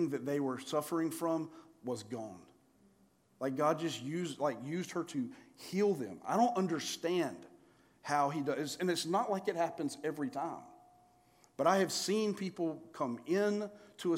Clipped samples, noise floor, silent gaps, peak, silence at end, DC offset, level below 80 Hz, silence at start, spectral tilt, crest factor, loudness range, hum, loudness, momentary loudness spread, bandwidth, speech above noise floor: under 0.1%; -69 dBFS; none; -16 dBFS; 0 s; under 0.1%; -84 dBFS; 0 s; -5 dB/octave; 20 dB; 4 LU; none; -36 LUFS; 11 LU; 16 kHz; 34 dB